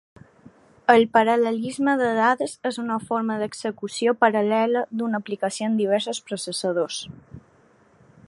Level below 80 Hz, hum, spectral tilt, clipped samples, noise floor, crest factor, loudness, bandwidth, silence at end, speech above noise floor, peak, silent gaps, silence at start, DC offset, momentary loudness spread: -66 dBFS; none; -4 dB/octave; under 0.1%; -57 dBFS; 22 dB; -23 LUFS; 11.5 kHz; 0.9 s; 35 dB; -2 dBFS; none; 0.9 s; under 0.1%; 10 LU